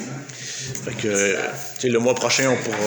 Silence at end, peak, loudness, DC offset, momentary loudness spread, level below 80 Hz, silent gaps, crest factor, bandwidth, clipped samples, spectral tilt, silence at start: 0 s; -6 dBFS; -21 LUFS; under 0.1%; 12 LU; -62 dBFS; none; 18 dB; over 20 kHz; under 0.1%; -3 dB/octave; 0 s